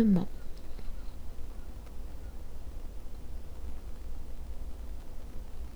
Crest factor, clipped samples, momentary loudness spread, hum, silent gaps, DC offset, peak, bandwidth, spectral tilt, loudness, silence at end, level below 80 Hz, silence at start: 18 dB; under 0.1%; 3 LU; none; none; under 0.1%; -16 dBFS; 11 kHz; -8.5 dB/octave; -42 LUFS; 0 s; -40 dBFS; 0 s